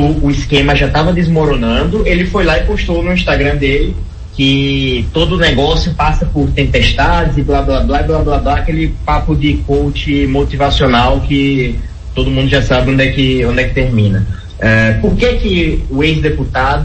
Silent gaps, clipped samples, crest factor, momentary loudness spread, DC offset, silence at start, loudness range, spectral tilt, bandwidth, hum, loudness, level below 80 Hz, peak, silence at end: none; under 0.1%; 12 dB; 5 LU; under 0.1%; 0 s; 1 LU; -6.5 dB/octave; 8.6 kHz; none; -12 LUFS; -18 dBFS; 0 dBFS; 0 s